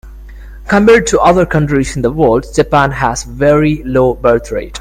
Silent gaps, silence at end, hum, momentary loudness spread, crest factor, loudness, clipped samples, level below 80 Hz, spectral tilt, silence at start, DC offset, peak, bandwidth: none; 0 s; none; 8 LU; 12 dB; -11 LUFS; 0.2%; -28 dBFS; -6 dB/octave; 0.05 s; under 0.1%; 0 dBFS; 16 kHz